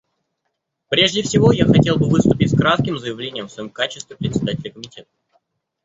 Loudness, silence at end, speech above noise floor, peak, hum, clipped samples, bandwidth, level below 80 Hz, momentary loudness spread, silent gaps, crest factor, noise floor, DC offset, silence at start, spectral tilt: -17 LUFS; 0.85 s; 58 dB; 0 dBFS; none; under 0.1%; 8 kHz; -44 dBFS; 15 LU; none; 18 dB; -75 dBFS; under 0.1%; 0.9 s; -5.5 dB/octave